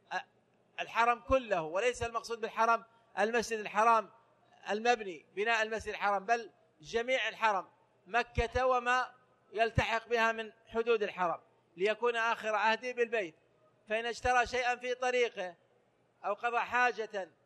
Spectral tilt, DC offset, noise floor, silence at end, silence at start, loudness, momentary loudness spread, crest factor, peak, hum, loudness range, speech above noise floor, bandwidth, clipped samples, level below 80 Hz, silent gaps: -3.5 dB/octave; under 0.1%; -71 dBFS; 0.2 s; 0.1 s; -32 LUFS; 11 LU; 20 dB; -14 dBFS; none; 2 LU; 39 dB; 12.5 kHz; under 0.1%; -56 dBFS; none